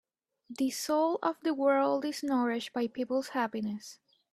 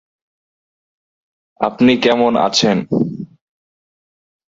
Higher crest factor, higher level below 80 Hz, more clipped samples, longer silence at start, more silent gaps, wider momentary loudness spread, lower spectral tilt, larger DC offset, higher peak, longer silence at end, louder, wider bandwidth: about the same, 18 dB vs 18 dB; second, -78 dBFS vs -56 dBFS; neither; second, 0.5 s vs 1.6 s; neither; about the same, 10 LU vs 11 LU; about the same, -4 dB/octave vs -4.5 dB/octave; neither; second, -14 dBFS vs 0 dBFS; second, 0.4 s vs 1.35 s; second, -31 LUFS vs -15 LUFS; first, 14.5 kHz vs 7.8 kHz